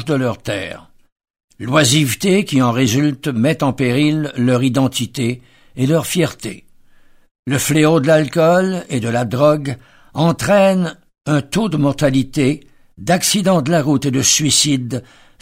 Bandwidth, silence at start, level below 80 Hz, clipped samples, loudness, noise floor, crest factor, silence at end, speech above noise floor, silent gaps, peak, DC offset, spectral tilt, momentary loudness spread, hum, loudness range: 16 kHz; 0 s; -48 dBFS; under 0.1%; -15 LUFS; -47 dBFS; 16 dB; 0.4 s; 31 dB; 1.12-1.16 s, 1.44-1.48 s, 7.31-7.43 s; 0 dBFS; under 0.1%; -4.5 dB/octave; 14 LU; none; 3 LU